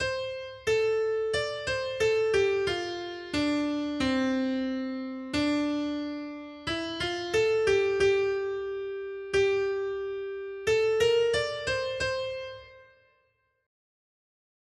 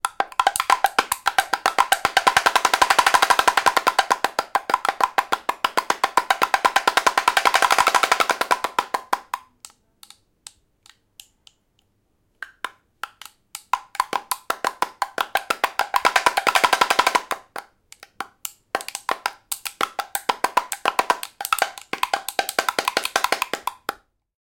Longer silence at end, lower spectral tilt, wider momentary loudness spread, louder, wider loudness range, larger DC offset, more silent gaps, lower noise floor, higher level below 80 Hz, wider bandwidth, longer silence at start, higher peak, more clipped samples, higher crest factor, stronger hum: first, 1.85 s vs 0.5 s; first, -4.5 dB/octave vs 0 dB/octave; second, 11 LU vs 16 LU; second, -28 LUFS vs -21 LUFS; second, 3 LU vs 14 LU; neither; neither; first, -72 dBFS vs -67 dBFS; about the same, -56 dBFS vs -58 dBFS; second, 12.5 kHz vs 17 kHz; about the same, 0 s vs 0.05 s; second, -14 dBFS vs 0 dBFS; neither; second, 16 dB vs 22 dB; neither